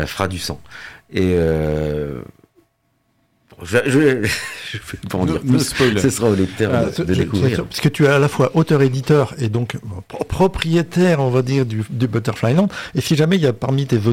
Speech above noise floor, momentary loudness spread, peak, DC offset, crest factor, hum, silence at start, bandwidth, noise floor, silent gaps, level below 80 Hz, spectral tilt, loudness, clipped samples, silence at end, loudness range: 48 dB; 12 LU; -4 dBFS; under 0.1%; 14 dB; none; 0 s; 16.5 kHz; -65 dBFS; none; -40 dBFS; -6 dB/octave; -18 LUFS; under 0.1%; 0 s; 5 LU